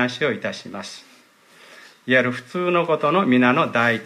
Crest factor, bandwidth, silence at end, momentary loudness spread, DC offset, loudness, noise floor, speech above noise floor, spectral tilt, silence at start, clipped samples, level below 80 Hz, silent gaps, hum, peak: 16 dB; 11.5 kHz; 0 s; 18 LU; under 0.1%; -19 LUFS; -52 dBFS; 32 dB; -5.5 dB/octave; 0 s; under 0.1%; -68 dBFS; none; none; -4 dBFS